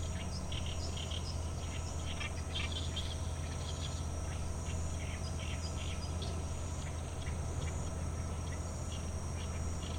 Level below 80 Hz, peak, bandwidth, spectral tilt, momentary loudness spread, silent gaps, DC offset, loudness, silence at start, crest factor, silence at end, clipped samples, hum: -46 dBFS; -26 dBFS; 15 kHz; -4.5 dB/octave; 2 LU; none; under 0.1%; -40 LUFS; 0 s; 12 dB; 0 s; under 0.1%; none